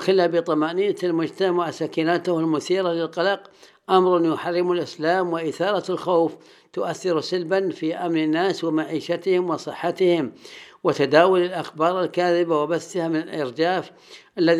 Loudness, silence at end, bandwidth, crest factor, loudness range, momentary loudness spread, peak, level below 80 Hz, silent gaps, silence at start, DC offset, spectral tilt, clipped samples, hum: -22 LUFS; 0 s; 11.5 kHz; 20 dB; 3 LU; 8 LU; -2 dBFS; -80 dBFS; none; 0 s; under 0.1%; -6 dB/octave; under 0.1%; none